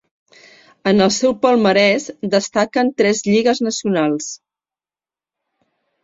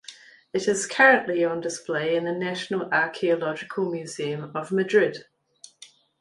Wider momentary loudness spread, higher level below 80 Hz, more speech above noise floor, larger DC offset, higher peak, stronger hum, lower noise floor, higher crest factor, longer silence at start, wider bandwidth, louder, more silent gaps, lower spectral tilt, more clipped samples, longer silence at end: second, 8 LU vs 13 LU; first, -58 dBFS vs -72 dBFS; first, over 74 dB vs 29 dB; neither; about the same, -2 dBFS vs -4 dBFS; neither; first, under -90 dBFS vs -53 dBFS; about the same, 16 dB vs 20 dB; first, 0.85 s vs 0.1 s; second, 7.8 kHz vs 11.5 kHz; first, -16 LUFS vs -24 LUFS; neither; about the same, -4 dB/octave vs -4 dB/octave; neither; first, 1.65 s vs 0.35 s